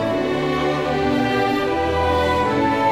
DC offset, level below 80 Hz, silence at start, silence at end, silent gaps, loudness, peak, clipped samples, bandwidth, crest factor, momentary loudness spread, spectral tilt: under 0.1%; -38 dBFS; 0 s; 0 s; none; -19 LUFS; -8 dBFS; under 0.1%; 16 kHz; 12 dB; 2 LU; -6 dB/octave